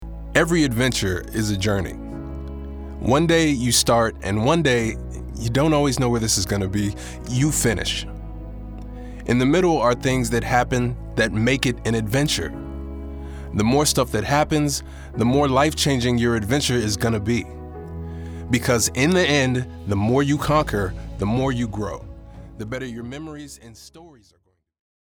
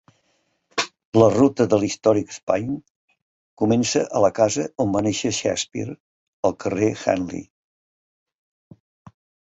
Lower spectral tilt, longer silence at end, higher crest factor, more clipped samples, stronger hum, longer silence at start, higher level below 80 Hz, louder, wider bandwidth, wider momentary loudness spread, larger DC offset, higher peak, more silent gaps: about the same, -4.5 dB/octave vs -5 dB/octave; second, 0.9 s vs 2 s; about the same, 22 dB vs 20 dB; neither; neither; second, 0 s vs 0.75 s; first, -36 dBFS vs -54 dBFS; about the same, -21 LUFS vs -21 LUFS; first, over 20 kHz vs 8.2 kHz; first, 17 LU vs 12 LU; neither; about the same, 0 dBFS vs -2 dBFS; second, none vs 1.05-1.12 s, 2.43-2.47 s, 2.90-3.08 s, 3.22-3.57 s, 6.00-6.43 s